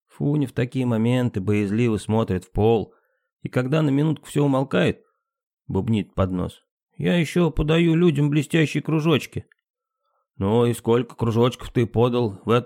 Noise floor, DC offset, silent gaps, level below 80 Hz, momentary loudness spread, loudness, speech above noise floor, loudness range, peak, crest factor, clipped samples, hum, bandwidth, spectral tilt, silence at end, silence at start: -74 dBFS; under 0.1%; 3.32-3.37 s, 5.43-5.57 s, 6.71-6.77 s, 6.83-6.87 s, 9.70-9.74 s; -44 dBFS; 7 LU; -22 LUFS; 53 dB; 3 LU; -6 dBFS; 16 dB; under 0.1%; none; 16 kHz; -7 dB/octave; 0 s; 0.2 s